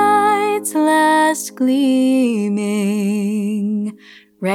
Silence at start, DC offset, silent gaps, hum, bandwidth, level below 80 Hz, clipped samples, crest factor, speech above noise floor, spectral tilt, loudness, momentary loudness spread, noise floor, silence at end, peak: 0 s; under 0.1%; none; none; 17 kHz; -78 dBFS; under 0.1%; 12 dB; 28 dB; -5 dB/octave; -16 LUFS; 7 LU; -44 dBFS; 0 s; -4 dBFS